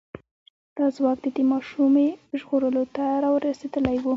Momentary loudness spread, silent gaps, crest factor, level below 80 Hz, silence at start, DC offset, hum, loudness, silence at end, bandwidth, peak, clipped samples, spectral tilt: 6 LU; 0.31-0.76 s; 16 dB; -56 dBFS; 0.15 s; under 0.1%; none; -24 LUFS; 0 s; 7.4 kHz; -6 dBFS; under 0.1%; -7.5 dB/octave